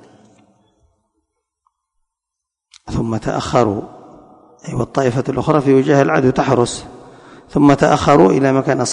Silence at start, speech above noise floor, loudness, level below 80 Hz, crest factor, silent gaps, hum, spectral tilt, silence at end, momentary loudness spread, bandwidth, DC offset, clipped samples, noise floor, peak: 2.85 s; 68 dB; -15 LUFS; -42 dBFS; 16 dB; none; none; -6 dB/octave; 0 s; 14 LU; 11 kHz; under 0.1%; under 0.1%; -81 dBFS; 0 dBFS